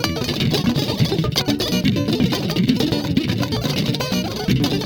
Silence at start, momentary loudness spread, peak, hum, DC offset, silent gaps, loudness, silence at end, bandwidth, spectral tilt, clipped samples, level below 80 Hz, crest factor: 0 s; 3 LU; 0 dBFS; none; under 0.1%; none; -20 LUFS; 0 s; over 20 kHz; -5.5 dB/octave; under 0.1%; -40 dBFS; 18 dB